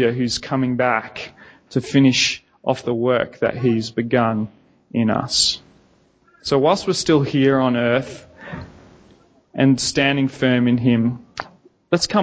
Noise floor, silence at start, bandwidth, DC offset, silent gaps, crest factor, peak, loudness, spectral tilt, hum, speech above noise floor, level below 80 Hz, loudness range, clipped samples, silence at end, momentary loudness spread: -57 dBFS; 0 s; 8 kHz; under 0.1%; none; 18 dB; -2 dBFS; -19 LUFS; -5 dB/octave; none; 38 dB; -52 dBFS; 2 LU; under 0.1%; 0 s; 17 LU